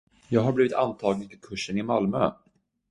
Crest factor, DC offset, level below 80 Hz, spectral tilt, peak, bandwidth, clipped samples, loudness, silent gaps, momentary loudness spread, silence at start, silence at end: 20 dB; under 0.1%; -58 dBFS; -6.5 dB/octave; -6 dBFS; 11.5 kHz; under 0.1%; -26 LUFS; none; 9 LU; 0.3 s; 0.55 s